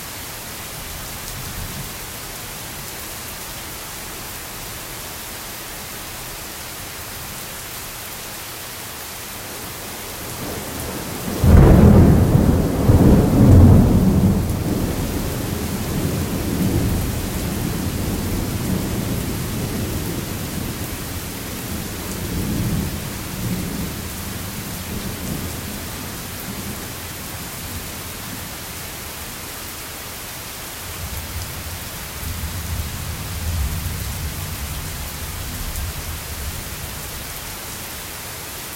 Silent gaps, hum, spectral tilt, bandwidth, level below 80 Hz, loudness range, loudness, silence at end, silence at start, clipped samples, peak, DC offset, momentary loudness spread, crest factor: none; none; -5.5 dB/octave; 16.5 kHz; -30 dBFS; 15 LU; -22 LUFS; 0 s; 0 s; under 0.1%; 0 dBFS; under 0.1%; 15 LU; 20 dB